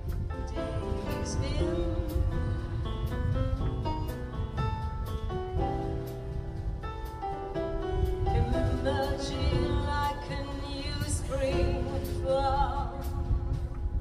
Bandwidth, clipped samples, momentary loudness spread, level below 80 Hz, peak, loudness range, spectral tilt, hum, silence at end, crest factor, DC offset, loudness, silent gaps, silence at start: 15.5 kHz; under 0.1%; 8 LU; -34 dBFS; -14 dBFS; 4 LU; -6.5 dB/octave; none; 0 s; 16 dB; under 0.1%; -32 LUFS; none; 0 s